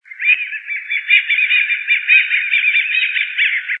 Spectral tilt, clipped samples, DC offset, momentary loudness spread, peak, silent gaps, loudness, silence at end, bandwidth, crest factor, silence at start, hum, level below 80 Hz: 10 dB/octave; under 0.1%; under 0.1%; 8 LU; 0 dBFS; none; -13 LUFS; 0 s; 4.1 kHz; 16 dB; 0.1 s; none; under -90 dBFS